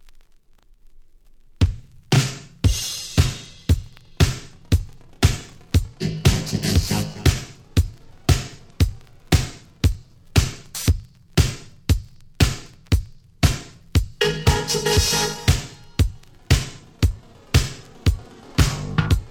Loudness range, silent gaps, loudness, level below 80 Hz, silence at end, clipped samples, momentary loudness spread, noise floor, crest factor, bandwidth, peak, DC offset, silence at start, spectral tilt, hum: 3 LU; none; -22 LUFS; -28 dBFS; 0 s; under 0.1%; 9 LU; -51 dBFS; 18 dB; 18.5 kHz; -2 dBFS; under 0.1%; 0.95 s; -4.5 dB/octave; none